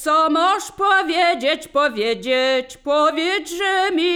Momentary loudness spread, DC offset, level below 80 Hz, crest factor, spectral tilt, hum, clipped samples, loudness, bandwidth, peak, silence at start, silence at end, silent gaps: 5 LU; under 0.1%; -56 dBFS; 14 dB; -2 dB/octave; none; under 0.1%; -18 LUFS; 19.5 kHz; -4 dBFS; 0 s; 0 s; none